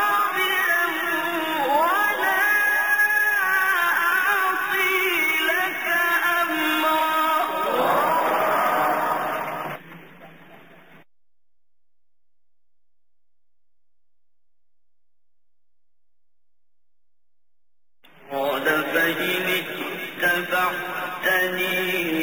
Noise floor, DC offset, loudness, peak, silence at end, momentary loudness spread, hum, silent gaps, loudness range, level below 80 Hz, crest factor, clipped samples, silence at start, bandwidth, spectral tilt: -85 dBFS; 0.3%; -21 LUFS; -8 dBFS; 0 s; 7 LU; none; none; 10 LU; -70 dBFS; 16 dB; under 0.1%; 0 s; over 20 kHz; -2.5 dB/octave